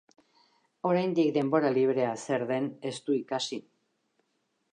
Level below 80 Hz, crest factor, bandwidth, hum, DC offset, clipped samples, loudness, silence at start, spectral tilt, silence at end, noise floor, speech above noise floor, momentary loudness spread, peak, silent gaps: -82 dBFS; 18 dB; 10 kHz; none; under 0.1%; under 0.1%; -29 LUFS; 0.85 s; -5.5 dB/octave; 1.15 s; -77 dBFS; 49 dB; 9 LU; -12 dBFS; none